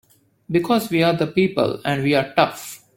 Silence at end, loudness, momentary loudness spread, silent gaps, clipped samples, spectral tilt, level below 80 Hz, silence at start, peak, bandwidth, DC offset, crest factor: 0.2 s; -20 LUFS; 5 LU; none; under 0.1%; -5.5 dB/octave; -56 dBFS; 0.5 s; -2 dBFS; 17 kHz; under 0.1%; 18 dB